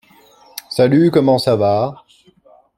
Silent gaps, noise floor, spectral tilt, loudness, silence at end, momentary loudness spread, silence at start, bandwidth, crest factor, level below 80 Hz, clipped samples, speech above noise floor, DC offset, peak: none; -51 dBFS; -7 dB/octave; -15 LUFS; 0.85 s; 16 LU; 0.7 s; 16.5 kHz; 16 dB; -56 dBFS; under 0.1%; 37 dB; under 0.1%; -2 dBFS